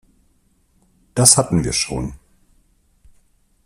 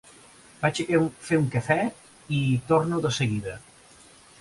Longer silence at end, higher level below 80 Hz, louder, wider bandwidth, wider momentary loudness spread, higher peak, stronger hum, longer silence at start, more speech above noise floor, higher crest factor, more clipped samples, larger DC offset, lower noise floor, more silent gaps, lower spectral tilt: first, 1.5 s vs 0.85 s; first, -42 dBFS vs -56 dBFS; first, -15 LUFS vs -25 LUFS; first, 15.5 kHz vs 11.5 kHz; first, 16 LU vs 8 LU; first, 0 dBFS vs -6 dBFS; neither; first, 1.15 s vs 0.6 s; first, 43 dB vs 28 dB; about the same, 22 dB vs 20 dB; neither; neither; first, -60 dBFS vs -52 dBFS; neither; second, -3.5 dB/octave vs -6 dB/octave